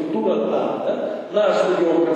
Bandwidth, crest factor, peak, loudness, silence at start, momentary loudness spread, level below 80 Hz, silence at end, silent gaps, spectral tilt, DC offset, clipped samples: 9 kHz; 12 dB; -6 dBFS; -20 LUFS; 0 s; 6 LU; -80 dBFS; 0 s; none; -6 dB/octave; under 0.1%; under 0.1%